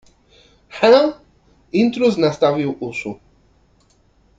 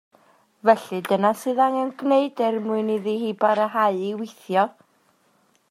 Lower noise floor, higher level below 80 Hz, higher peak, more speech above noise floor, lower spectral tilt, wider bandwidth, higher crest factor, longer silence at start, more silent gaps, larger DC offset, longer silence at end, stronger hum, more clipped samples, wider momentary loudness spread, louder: second, -57 dBFS vs -63 dBFS; first, -56 dBFS vs -78 dBFS; about the same, 0 dBFS vs -2 dBFS; about the same, 41 dB vs 41 dB; about the same, -6 dB/octave vs -6 dB/octave; second, 7.8 kHz vs 15.5 kHz; about the same, 18 dB vs 20 dB; about the same, 0.75 s vs 0.65 s; neither; neither; first, 1.25 s vs 1 s; neither; neither; first, 17 LU vs 6 LU; first, -17 LUFS vs -22 LUFS